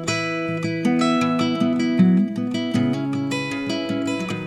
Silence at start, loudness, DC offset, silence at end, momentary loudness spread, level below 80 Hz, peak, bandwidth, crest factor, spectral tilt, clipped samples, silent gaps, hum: 0 s; -21 LUFS; under 0.1%; 0 s; 7 LU; -58 dBFS; -6 dBFS; 12 kHz; 16 dB; -6 dB/octave; under 0.1%; none; none